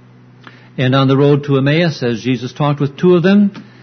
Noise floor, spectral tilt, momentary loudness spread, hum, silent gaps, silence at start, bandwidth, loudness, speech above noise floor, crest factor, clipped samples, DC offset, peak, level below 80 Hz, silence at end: -40 dBFS; -7.5 dB/octave; 8 LU; none; none; 0.8 s; 6.4 kHz; -14 LUFS; 28 dB; 14 dB; under 0.1%; under 0.1%; 0 dBFS; -54 dBFS; 0.2 s